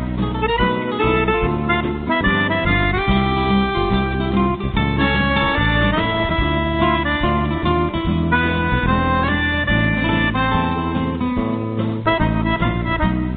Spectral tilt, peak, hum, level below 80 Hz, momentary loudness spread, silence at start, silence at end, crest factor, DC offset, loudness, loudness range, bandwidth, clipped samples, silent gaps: -4.5 dB/octave; -4 dBFS; none; -28 dBFS; 4 LU; 0 s; 0 s; 14 dB; under 0.1%; -18 LUFS; 1 LU; 4.7 kHz; under 0.1%; none